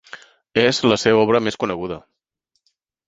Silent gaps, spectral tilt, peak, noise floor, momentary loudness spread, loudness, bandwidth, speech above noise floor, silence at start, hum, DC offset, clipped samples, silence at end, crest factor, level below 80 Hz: none; -4.5 dB/octave; 0 dBFS; -73 dBFS; 13 LU; -18 LUFS; 8 kHz; 56 dB; 0.15 s; none; under 0.1%; under 0.1%; 1.1 s; 20 dB; -54 dBFS